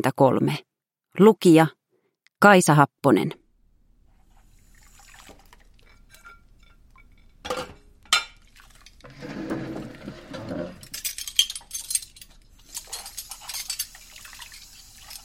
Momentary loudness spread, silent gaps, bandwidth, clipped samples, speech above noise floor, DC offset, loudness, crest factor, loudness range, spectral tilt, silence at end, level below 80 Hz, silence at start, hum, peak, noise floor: 25 LU; none; 16.5 kHz; under 0.1%; 54 dB; under 0.1%; -22 LUFS; 24 dB; 15 LU; -4.5 dB/octave; 0.1 s; -56 dBFS; 0 s; none; -2 dBFS; -71 dBFS